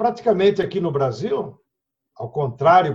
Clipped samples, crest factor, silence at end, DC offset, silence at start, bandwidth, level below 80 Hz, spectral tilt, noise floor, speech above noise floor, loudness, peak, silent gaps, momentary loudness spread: under 0.1%; 18 dB; 0 s; under 0.1%; 0 s; 7.6 kHz; -58 dBFS; -7.5 dB/octave; -80 dBFS; 61 dB; -20 LUFS; -2 dBFS; none; 14 LU